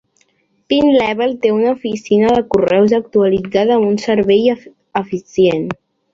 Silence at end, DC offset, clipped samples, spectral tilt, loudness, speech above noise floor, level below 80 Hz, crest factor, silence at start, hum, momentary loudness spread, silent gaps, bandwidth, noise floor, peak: 0.4 s; under 0.1%; under 0.1%; -6.5 dB/octave; -14 LUFS; 46 dB; -50 dBFS; 14 dB; 0.7 s; none; 9 LU; none; 7.6 kHz; -60 dBFS; -2 dBFS